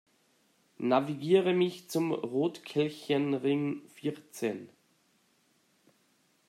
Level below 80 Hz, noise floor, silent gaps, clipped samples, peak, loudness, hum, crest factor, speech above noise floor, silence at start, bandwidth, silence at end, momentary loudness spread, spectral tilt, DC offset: -82 dBFS; -70 dBFS; none; under 0.1%; -12 dBFS; -31 LUFS; none; 20 dB; 40 dB; 0.8 s; 15.5 kHz; 1.8 s; 10 LU; -6 dB/octave; under 0.1%